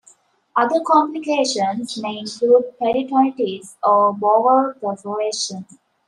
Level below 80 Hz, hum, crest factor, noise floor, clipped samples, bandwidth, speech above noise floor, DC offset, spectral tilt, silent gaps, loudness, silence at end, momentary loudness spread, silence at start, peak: -66 dBFS; none; 16 dB; -54 dBFS; under 0.1%; 11.5 kHz; 36 dB; under 0.1%; -4 dB/octave; none; -19 LUFS; 0.45 s; 10 LU; 0.55 s; -2 dBFS